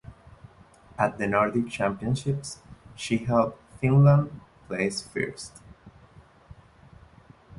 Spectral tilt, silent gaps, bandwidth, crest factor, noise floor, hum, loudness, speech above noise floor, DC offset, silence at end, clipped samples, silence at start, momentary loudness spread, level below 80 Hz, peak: -6.5 dB/octave; none; 11.5 kHz; 22 dB; -54 dBFS; none; -26 LUFS; 29 dB; under 0.1%; 0.05 s; under 0.1%; 0.1 s; 20 LU; -54 dBFS; -6 dBFS